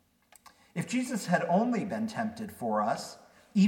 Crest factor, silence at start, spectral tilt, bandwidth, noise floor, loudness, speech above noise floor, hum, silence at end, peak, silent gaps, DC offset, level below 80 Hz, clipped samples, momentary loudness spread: 18 dB; 0.75 s; -6 dB/octave; 16.5 kHz; -59 dBFS; -31 LUFS; 29 dB; none; 0 s; -14 dBFS; none; under 0.1%; -74 dBFS; under 0.1%; 10 LU